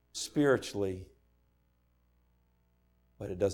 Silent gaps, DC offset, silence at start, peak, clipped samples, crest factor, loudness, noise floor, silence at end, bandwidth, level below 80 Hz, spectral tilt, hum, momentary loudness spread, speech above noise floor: none; under 0.1%; 0.15 s; -16 dBFS; under 0.1%; 20 dB; -32 LUFS; -71 dBFS; 0 s; 17 kHz; -64 dBFS; -5 dB/octave; 60 Hz at -70 dBFS; 16 LU; 41 dB